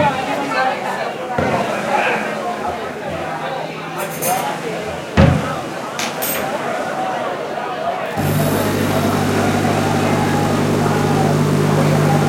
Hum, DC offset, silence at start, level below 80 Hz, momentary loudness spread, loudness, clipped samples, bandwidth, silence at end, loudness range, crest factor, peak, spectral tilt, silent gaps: none; under 0.1%; 0 s; -42 dBFS; 9 LU; -18 LUFS; under 0.1%; 16.5 kHz; 0 s; 4 LU; 18 dB; 0 dBFS; -5.5 dB/octave; none